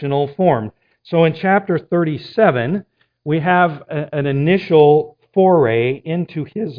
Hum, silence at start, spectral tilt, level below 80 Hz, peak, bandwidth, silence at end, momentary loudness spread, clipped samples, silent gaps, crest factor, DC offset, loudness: none; 0 s; -10 dB/octave; -56 dBFS; 0 dBFS; 5.2 kHz; 0 s; 11 LU; under 0.1%; none; 16 dB; under 0.1%; -16 LUFS